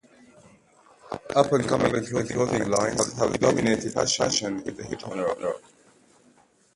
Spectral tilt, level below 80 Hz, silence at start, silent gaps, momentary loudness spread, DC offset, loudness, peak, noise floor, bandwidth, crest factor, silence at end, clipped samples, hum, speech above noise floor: -4 dB/octave; -54 dBFS; 1.05 s; none; 12 LU; under 0.1%; -25 LUFS; -4 dBFS; -60 dBFS; 11.5 kHz; 22 dB; 1.15 s; under 0.1%; none; 36 dB